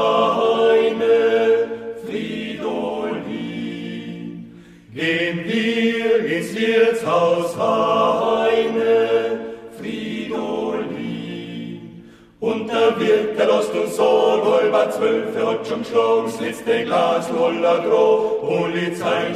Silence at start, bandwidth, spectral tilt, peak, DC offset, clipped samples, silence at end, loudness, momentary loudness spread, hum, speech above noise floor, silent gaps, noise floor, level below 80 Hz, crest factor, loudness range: 0 s; 13.5 kHz; -5 dB/octave; -4 dBFS; under 0.1%; under 0.1%; 0 s; -19 LUFS; 13 LU; none; 24 dB; none; -43 dBFS; -60 dBFS; 14 dB; 7 LU